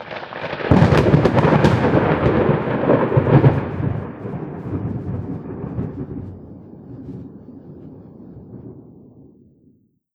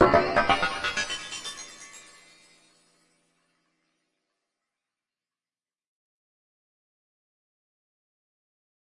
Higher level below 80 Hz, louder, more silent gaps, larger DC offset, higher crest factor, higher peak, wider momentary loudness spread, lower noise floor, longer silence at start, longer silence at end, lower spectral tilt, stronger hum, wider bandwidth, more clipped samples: first, -38 dBFS vs -54 dBFS; first, -18 LUFS vs -25 LUFS; neither; neither; second, 20 dB vs 26 dB; first, 0 dBFS vs -4 dBFS; about the same, 25 LU vs 23 LU; second, -57 dBFS vs under -90 dBFS; about the same, 0 s vs 0 s; second, 1.35 s vs 7 s; first, -8.5 dB/octave vs -3.5 dB/octave; neither; second, 8.6 kHz vs 11.5 kHz; neither